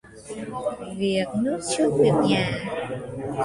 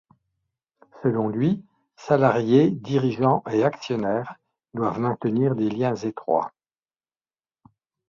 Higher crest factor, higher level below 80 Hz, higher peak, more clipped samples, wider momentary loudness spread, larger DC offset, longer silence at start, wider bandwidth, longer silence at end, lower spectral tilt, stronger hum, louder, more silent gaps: about the same, 18 dB vs 20 dB; first, -54 dBFS vs -62 dBFS; second, -8 dBFS vs -4 dBFS; neither; first, 13 LU vs 10 LU; neither; second, 0.05 s vs 0.95 s; first, 11.5 kHz vs 7.2 kHz; second, 0 s vs 1.6 s; second, -5.5 dB/octave vs -8 dB/octave; neither; about the same, -24 LUFS vs -23 LUFS; neither